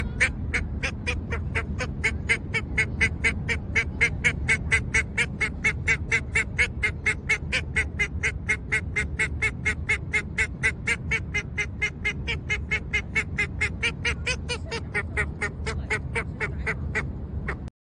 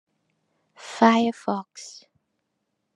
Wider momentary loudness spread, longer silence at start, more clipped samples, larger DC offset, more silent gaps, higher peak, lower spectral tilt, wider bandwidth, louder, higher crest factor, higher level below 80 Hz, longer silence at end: second, 7 LU vs 23 LU; second, 0 s vs 0.85 s; neither; neither; neither; second, -6 dBFS vs -2 dBFS; about the same, -4 dB/octave vs -5 dB/octave; about the same, 10.5 kHz vs 10.5 kHz; second, -26 LUFS vs -22 LUFS; about the same, 20 dB vs 24 dB; first, -36 dBFS vs -80 dBFS; second, 0.15 s vs 1.05 s